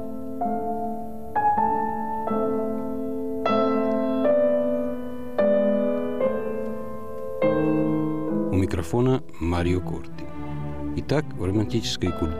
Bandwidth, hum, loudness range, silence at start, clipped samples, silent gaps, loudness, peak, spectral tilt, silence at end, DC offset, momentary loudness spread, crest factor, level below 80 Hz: 15 kHz; none; 3 LU; 0 s; under 0.1%; none; -25 LUFS; -10 dBFS; -7 dB/octave; 0 s; 2%; 12 LU; 14 dB; -44 dBFS